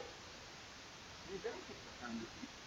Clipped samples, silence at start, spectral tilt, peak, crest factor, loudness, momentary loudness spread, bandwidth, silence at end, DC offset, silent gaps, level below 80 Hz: under 0.1%; 0 s; -3.5 dB/octave; -32 dBFS; 18 dB; -49 LUFS; 6 LU; 16 kHz; 0 s; under 0.1%; none; -68 dBFS